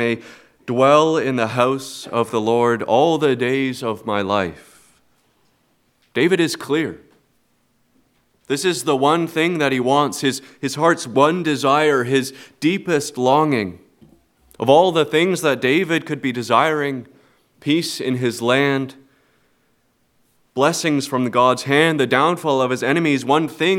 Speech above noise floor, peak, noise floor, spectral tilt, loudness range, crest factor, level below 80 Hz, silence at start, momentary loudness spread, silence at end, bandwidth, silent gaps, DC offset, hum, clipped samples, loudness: 45 dB; 0 dBFS; -63 dBFS; -5 dB/octave; 5 LU; 18 dB; -66 dBFS; 0 s; 9 LU; 0 s; 17 kHz; none; under 0.1%; none; under 0.1%; -18 LUFS